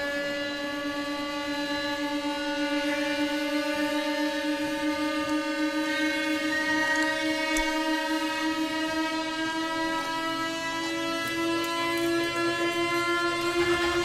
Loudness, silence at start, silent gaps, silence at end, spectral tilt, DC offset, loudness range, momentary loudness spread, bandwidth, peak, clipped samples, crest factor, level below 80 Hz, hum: -27 LUFS; 0 s; none; 0 s; -3 dB/octave; under 0.1%; 2 LU; 4 LU; 15.5 kHz; -12 dBFS; under 0.1%; 16 dB; -54 dBFS; none